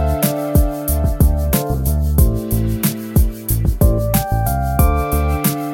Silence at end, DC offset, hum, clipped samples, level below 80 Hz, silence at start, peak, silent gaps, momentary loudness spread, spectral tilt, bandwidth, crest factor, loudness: 0 s; under 0.1%; none; under 0.1%; -18 dBFS; 0 s; 0 dBFS; none; 3 LU; -6 dB/octave; 17 kHz; 14 dB; -17 LUFS